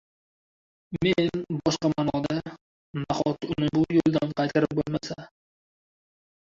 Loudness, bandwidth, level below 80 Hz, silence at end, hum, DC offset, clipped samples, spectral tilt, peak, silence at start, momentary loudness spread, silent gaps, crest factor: -26 LUFS; 7.6 kHz; -54 dBFS; 1.3 s; none; under 0.1%; under 0.1%; -6.5 dB/octave; -8 dBFS; 0.9 s; 14 LU; 2.61-2.94 s; 18 dB